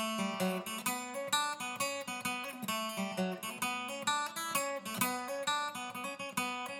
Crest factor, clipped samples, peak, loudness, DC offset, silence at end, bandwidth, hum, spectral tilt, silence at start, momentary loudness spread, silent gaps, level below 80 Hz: 24 dB; under 0.1%; -14 dBFS; -36 LUFS; under 0.1%; 0 s; 19.5 kHz; none; -2.5 dB/octave; 0 s; 4 LU; none; -84 dBFS